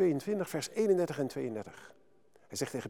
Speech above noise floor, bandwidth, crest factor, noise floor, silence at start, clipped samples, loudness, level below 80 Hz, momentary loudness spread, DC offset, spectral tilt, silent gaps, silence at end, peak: 33 dB; 17.5 kHz; 18 dB; -66 dBFS; 0 s; under 0.1%; -34 LUFS; -76 dBFS; 14 LU; under 0.1%; -5.5 dB/octave; none; 0 s; -16 dBFS